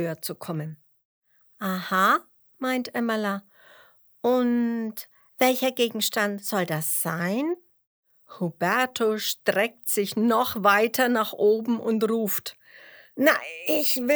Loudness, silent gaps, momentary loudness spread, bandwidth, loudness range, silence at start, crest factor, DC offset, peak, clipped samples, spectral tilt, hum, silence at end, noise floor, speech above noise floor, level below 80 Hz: -24 LUFS; 1.05-1.22 s, 7.87-8.03 s; 11 LU; over 20 kHz; 4 LU; 0 s; 20 dB; under 0.1%; -4 dBFS; under 0.1%; -4 dB/octave; none; 0 s; -56 dBFS; 32 dB; -74 dBFS